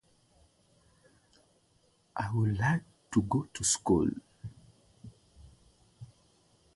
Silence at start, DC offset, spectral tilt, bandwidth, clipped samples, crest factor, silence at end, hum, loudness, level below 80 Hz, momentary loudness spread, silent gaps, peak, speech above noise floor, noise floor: 2.15 s; under 0.1%; -5 dB/octave; 11.5 kHz; under 0.1%; 22 dB; 0.7 s; none; -31 LUFS; -56 dBFS; 26 LU; none; -14 dBFS; 40 dB; -69 dBFS